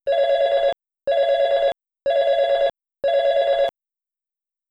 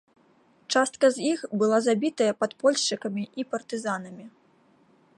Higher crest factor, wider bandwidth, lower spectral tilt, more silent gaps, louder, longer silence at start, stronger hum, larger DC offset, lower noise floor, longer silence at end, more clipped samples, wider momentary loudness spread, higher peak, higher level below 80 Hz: second, 10 dB vs 18 dB; second, 7.6 kHz vs 11.5 kHz; about the same, -2.5 dB/octave vs -3.5 dB/octave; neither; first, -20 LUFS vs -26 LUFS; second, 0.05 s vs 0.7 s; neither; neither; first, -87 dBFS vs -61 dBFS; about the same, 1 s vs 0.9 s; neither; second, 6 LU vs 10 LU; about the same, -10 dBFS vs -8 dBFS; first, -58 dBFS vs -78 dBFS